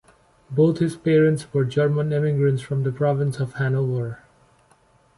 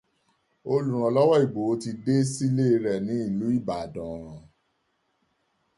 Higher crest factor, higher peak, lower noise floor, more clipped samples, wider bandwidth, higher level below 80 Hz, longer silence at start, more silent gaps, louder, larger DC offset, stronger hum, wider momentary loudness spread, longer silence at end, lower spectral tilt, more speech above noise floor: about the same, 14 dB vs 18 dB; about the same, -8 dBFS vs -8 dBFS; second, -58 dBFS vs -73 dBFS; neither; about the same, 11.5 kHz vs 11.5 kHz; about the same, -58 dBFS vs -60 dBFS; second, 0.5 s vs 0.65 s; neither; first, -22 LUFS vs -25 LUFS; neither; neither; second, 7 LU vs 15 LU; second, 1 s vs 1.4 s; about the same, -8 dB/octave vs -7 dB/octave; second, 38 dB vs 49 dB